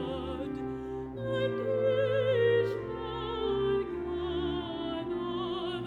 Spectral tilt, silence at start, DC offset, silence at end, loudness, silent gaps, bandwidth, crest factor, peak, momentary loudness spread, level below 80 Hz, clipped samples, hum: -7.5 dB/octave; 0 s; under 0.1%; 0 s; -32 LUFS; none; 9.8 kHz; 14 dB; -16 dBFS; 10 LU; -50 dBFS; under 0.1%; none